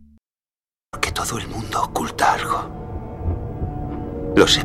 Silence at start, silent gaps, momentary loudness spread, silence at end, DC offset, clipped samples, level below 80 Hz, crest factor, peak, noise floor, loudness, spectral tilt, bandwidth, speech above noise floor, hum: 0 s; none; 12 LU; 0 s; under 0.1%; under 0.1%; -36 dBFS; 20 dB; -2 dBFS; under -90 dBFS; -23 LUFS; -4 dB/octave; 16 kHz; over 70 dB; none